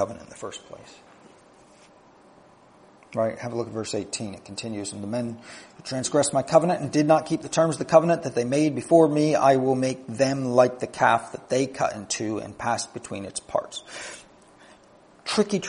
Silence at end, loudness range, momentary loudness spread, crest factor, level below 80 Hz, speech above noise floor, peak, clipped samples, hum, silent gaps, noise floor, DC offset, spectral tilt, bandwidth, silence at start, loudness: 0 s; 12 LU; 18 LU; 22 dB; -64 dBFS; 30 dB; -2 dBFS; under 0.1%; none; none; -54 dBFS; under 0.1%; -5 dB/octave; 10.5 kHz; 0 s; -24 LUFS